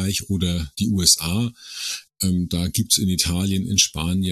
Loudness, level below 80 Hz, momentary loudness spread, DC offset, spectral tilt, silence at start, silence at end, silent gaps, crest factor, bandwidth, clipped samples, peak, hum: -20 LUFS; -40 dBFS; 12 LU; under 0.1%; -3.5 dB/octave; 0 s; 0 s; none; 20 dB; 14 kHz; under 0.1%; -2 dBFS; none